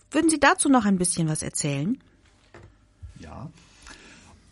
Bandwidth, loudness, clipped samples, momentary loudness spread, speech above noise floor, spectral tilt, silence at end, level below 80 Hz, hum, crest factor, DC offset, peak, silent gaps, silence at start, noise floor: 11.5 kHz; -22 LUFS; under 0.1%; 24 LU; 31 dB; -4 dB/octave; 0.6 s; -52 dBFS; none; 22 dB; under 0.1%; -4 dBFS; none; 0.1 s; -54 dBFS